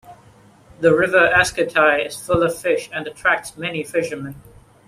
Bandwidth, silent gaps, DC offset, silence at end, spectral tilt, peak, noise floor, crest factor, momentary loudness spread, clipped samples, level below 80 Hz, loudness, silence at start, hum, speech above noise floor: 15.5 kHz; none; under 0.1%; 0.45 s; -4 dB/octave; -2 dBFS; -49 dBFS; 18 dB; 13 LU; under 0.1%; -48 dBFS; -18 LUFS; 0.1 s; none; 31 dB